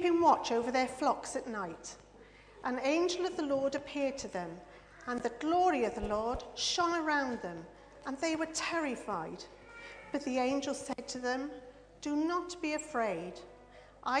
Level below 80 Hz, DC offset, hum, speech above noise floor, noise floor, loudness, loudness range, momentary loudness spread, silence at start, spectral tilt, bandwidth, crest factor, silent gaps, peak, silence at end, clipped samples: -60 dBFS; under 0.1%; 50 Hz at -65 dBFS; 23 dB; -57 dBFS; -34 LUFS; 4 LU; 18 LU; 0 s; -3.5 dB/octave; 10 kHz; 20 dB; none; -14 dBFS; 0 s; under 0.1%